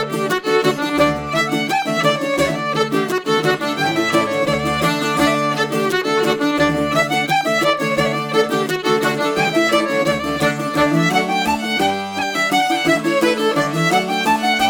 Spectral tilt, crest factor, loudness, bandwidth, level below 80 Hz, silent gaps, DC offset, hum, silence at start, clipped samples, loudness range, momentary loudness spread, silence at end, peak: -4.5 dB/octave; 16 dB; -17 LUFS; over 20 kHz; -46 dBFS; none; under 0.1%; none; 0 s; under 0.1%; 1 LU; 3 LU; 0 s; -2 dBFS